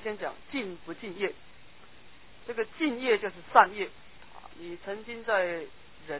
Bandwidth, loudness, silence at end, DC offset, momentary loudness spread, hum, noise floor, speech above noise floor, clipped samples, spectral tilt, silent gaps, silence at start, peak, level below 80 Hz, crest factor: 4 kHz; -30 LUFS; 0 s; 0.4%; 24 LU; none; -55 dBFS; 26 dB; under 0.1%; -1.5 dB/octave; none; 0 s; -4 dBFS; -64 dBFS; 28 dB